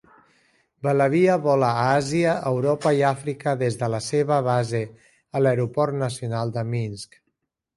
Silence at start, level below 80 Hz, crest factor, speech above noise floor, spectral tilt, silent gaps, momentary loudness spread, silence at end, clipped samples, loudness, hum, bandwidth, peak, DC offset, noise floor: 0.85 s; -60 dBFS; 16 dB; 55 dB; -6.5 dB/octave; none; 10 LU; 0.7 s; under 0.1%; -23 LUFS; none; 11.5 kHz; -6 dBFS; under 0.1%; -76 dBFS